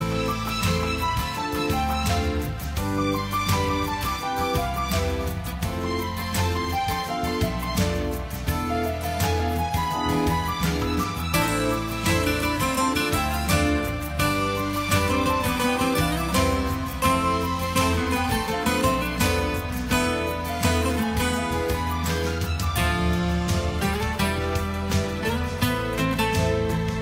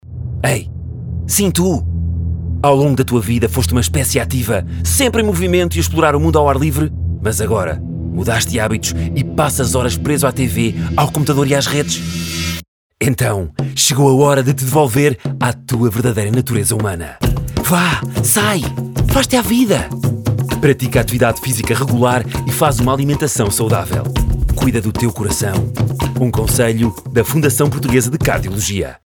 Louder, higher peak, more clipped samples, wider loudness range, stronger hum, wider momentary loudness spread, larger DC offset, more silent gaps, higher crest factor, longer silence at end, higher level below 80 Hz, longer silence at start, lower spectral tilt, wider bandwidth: second, -24 LUFS vs -15 LUFS; second, -6 dBFS vs 0 dBFS; neither; about the same, 3 LU vs 2 LU; neither; about the same, 5 LU vs 7 LU; neither; second, none vs 12.68-12.90 s; about the same, 18 dB vs 14 dB; about the same, 0 s vs 0.1 s; second, -34 dBFS vs -28 dBFS; about the same, 0 s vs 0.05 s; about the same, -5 dB/octave vs -5 dB/octave; second, 16 kHz vs over 20 kHz